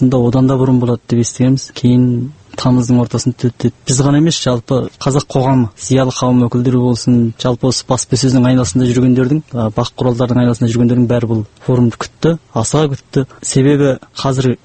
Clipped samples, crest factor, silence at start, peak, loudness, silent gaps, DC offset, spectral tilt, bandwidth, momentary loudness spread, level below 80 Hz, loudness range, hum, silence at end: under 0.1%; 12 dB; 0 s; 0 dBFS; -13 LUFS; none; under 0.1%; -6 dB/octave; 8.8 kHz; 6 LU; -40 dBFS; 2 LU; none; 0.1 s